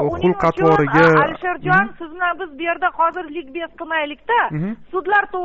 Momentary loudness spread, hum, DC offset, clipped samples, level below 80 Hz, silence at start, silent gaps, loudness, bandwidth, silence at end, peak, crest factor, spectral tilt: 13 LU; none; under 0.1%; under 0.1%; -46 dBFS; 0 s; none; -18 LUFS; 7.6 kHz; 0 s; -4 dBFS; 14 dB; -4.5 dB/octave